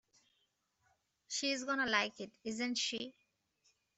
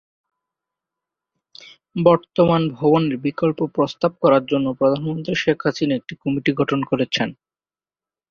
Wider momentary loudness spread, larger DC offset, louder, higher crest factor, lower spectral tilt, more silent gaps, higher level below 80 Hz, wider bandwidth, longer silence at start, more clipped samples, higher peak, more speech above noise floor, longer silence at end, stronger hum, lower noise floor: first, 11 LU vs 7 LU; neither; second, -37 LUFS vs -20 LUFS; first, 26 dB vs 18 dB; second, -1.5 dB/octave vs -7 dB/octave; neither; second, -80 dBFS vs -56 dBFS; first, 8.2 kHz vs 7 kHz; second, 1.3 s vs 1.95 s; neither; second, -16 dBFS vs -2 dBFS; second, 43 dB vs over 71 dB; about the same, 0.85 s vs 0.95 s; neither; second, -81 dBFS vs under -90 dBFS